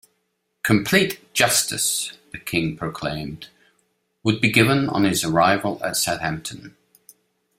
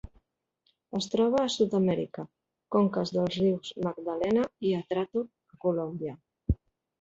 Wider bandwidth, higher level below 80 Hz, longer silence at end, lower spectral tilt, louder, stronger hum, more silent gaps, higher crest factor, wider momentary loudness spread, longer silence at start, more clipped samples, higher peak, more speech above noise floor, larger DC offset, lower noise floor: first, 16 kHz vs 8 kHz; second, -54 dBFS vs -48 dBFS; first, 0.9 s vs 0.45 s; second, -3.5 dB/octave vs -6.5 dB/octave; first, -20 LUFS vs -29 LUFS; neither; neither; about the same, 22 dB vs 18 dB; about the same, 14 LU vs 12 LU; first, 0.65 s vs 0.05 s; neither; first, -2 dBFS vs -12 dBFS; first, 52 dB vs 48 dB; neither; about the same, -73 dBFS vs -76 dBFS